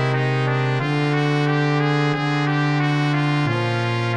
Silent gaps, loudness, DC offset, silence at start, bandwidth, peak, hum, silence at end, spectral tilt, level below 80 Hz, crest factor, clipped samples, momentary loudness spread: none; -20 LUFS; 0.2%; 0 s; 9.4 kHz; -6 dBFS; none; 0 s; -7 dB/octave; -64 dBFS; 12 dB; under 0.1%; 2 LU